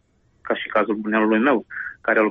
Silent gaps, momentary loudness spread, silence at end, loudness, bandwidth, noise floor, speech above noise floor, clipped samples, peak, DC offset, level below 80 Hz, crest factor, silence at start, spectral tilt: none; 9 LU; 0 s; -21 LUFS; 4.7 kHz; -44 dBFS; 24 dB; under 0.1%; -6 dBFS; under 0.1%; -62 dBFS; 14 dB; 0.45 s; -8.5 dB/octave